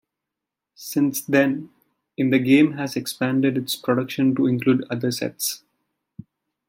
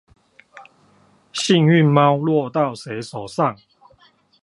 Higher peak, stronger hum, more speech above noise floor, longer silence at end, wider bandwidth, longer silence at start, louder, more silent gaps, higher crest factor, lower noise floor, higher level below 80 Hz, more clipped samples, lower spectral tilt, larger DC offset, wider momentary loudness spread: about the same, -4 dBFS vs -2 dBFS; neither; first, 64 dB vs 39 dB; first, 1.1 s vs 0.9 s; first, 16.5 kHz vs 11.5 kHz; first, 0.8 s vs 0.55 s; second, -21 LUFS vs -18 LUFS; neither; about the same, 18 dB vs 18 dB; first, -85 dBFS vs -56 dBFS; about the same, -68 dBFS vs -64 dBFS; neither; about the same, -5 dB/octave vs -6 dB/octave; neither; second, 10 LU vs 16 LU